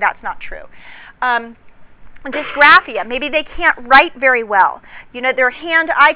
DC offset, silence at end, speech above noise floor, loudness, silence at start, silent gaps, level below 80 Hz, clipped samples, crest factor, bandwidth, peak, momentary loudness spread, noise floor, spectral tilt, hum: under 0.1%; 0 s; 20 dB; -13 LUFS; 0 s; none; -44 dBFS; 0.8%; 16 dB; 4 kHz; 0 dBFS; 22 LU; -35 dBFS; -5.5 dB/octave; none